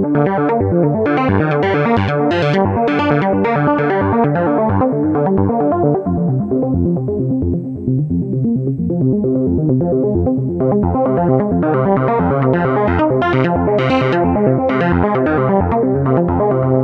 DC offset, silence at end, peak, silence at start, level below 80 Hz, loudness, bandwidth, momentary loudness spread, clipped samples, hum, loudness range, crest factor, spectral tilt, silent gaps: under 0.1%; 0 s; -2 dBFS; 0 s; -40 dBFS; -15 LUFS; 6.4 kHz; 3 LU; under 0.1%; none; 2 LU; 14 dB; -9.5 dB/octave; none